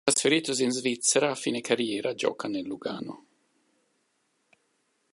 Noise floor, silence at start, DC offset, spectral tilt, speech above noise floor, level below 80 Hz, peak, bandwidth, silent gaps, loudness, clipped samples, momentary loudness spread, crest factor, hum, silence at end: -73 dBFS; 0.05 s; under 0.1%; -2.5 dB/octave; 46 dB; -76 dBFS; -6 dBFS; 11.5 kHz; none; -27 LUFS; under 0.1%; 11 LU; 24 dB; none; 1.95 s